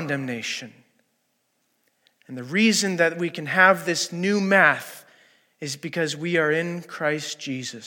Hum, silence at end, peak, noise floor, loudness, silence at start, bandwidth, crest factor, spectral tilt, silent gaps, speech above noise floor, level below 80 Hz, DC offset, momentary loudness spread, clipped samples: none; 0 s; -2 dBFS; -71 dBFS; -22 LUFS; 0 s; 17.5 kHz; 22 dB; -4 dB/octave; none; 48 dB; -80 dBFS; under 0.1%; 15 LU; under 0.1%